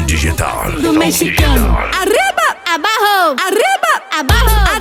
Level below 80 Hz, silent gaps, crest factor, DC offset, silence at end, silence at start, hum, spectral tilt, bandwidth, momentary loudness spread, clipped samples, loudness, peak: -18 dBFS; none; 12 dB; under 0.1%; 0 s; 0 s; none; -4 dB/octave; 17.5 kHz; 4 LU; under 0.1%; -12 LUFS; 0 dBFS